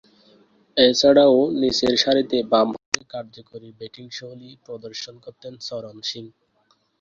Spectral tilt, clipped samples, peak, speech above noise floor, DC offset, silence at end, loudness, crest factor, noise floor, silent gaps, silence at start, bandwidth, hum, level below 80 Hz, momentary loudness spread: -3.5 dB/octave; under 0.1%; 0 dBFS; 44 dB; under 0.1%; 0.75 s; -18 LUFS; 22 dB; -65 dBFS; 2.86-2.92 s; 0.75 s; 7.8 kHz; none; -58 dBFS; 25 LU